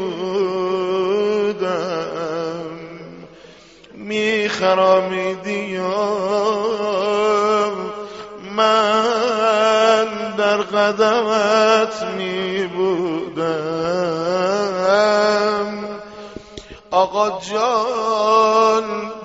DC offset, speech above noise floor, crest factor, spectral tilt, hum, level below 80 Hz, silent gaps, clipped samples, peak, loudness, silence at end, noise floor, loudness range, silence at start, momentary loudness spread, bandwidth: under 0.1%; 26 dB; 16 dB; -2.5 dB/octave; none; -58 dBFS; none; under 0.1%; -2 dBFS; -18 LUFS; 0 s; -44 dBFS; 5 LU; 0 s; 14 LU; 8 kHz